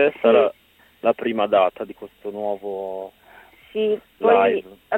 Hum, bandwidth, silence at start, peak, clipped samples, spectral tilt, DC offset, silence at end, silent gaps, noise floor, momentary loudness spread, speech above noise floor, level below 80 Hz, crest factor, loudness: none; 15.5 kHz; 0 s; -2 dBFS; under 0.1%; -6.5 dB/octave; under 0.1%; 0 s; none; -49 dBFS; 18 LU; 29 dB; -64 dBFS; 18 dB; -21 LUFS